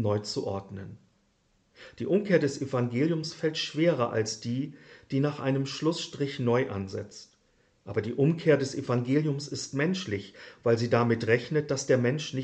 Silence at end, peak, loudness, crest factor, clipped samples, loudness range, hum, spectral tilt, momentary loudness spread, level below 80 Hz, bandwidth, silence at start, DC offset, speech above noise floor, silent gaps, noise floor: 0 s; -10 dBFS; -28 LUFS; 18 dB; under 0.1%; 3 LU; none; -6 dB/octave; 12 LU; -68 dBFS; 8.8 kHz; 0 s; under 0.1%; 41 dB; none; -69 dBFS